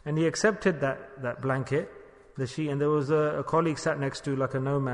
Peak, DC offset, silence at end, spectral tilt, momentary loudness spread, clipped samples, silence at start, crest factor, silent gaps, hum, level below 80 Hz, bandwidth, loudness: -10 dBFS; under 0.1%; 0 s; -6 dB/octave; 10 LU; under 0.1%; 0.05 s; 18 dB; none; none; -60 dBFS; 10.5 kHz; -28 LUFS